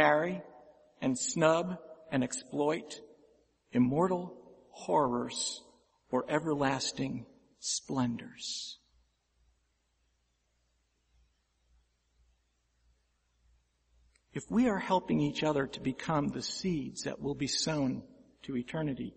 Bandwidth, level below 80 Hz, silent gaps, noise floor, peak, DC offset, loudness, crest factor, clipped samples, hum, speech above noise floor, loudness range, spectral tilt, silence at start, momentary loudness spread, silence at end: 8.4 kHz; -64 dBFS; none; -76 dBFS; -10 dBFS; under 0.1%; -33 LUFS; 24 dB; under 0.1%; none; 44 dB; 7 LU; -4.5 dB/octave; 0 s; 15 LU; 0.05 s